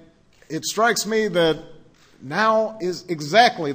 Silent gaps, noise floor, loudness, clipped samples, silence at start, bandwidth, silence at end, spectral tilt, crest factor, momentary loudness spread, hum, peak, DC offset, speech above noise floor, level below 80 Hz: none; -53 dBFS; -20 LUFS; under 0.1%; 0.5 s; 16 kHz; 0 s; -3.5 dB/octave; 18 dB; 12 LU; none; -2 dBFS; under 0.1%; 32 dB; -58 dBFS